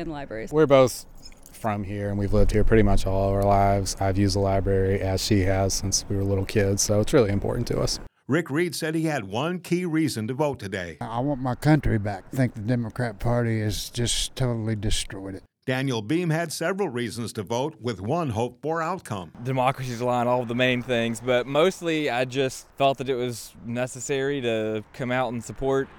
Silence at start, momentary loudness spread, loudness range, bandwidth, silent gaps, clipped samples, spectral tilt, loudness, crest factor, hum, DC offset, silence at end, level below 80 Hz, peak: 0 s; 9 LU; 4 LU; 18.5 kHz; none; under 0.1%; -5 dB/octave; -25 LUFS; 18 dB; none; under 0.1%; 0 s; -36 dBFS; -6 dBFS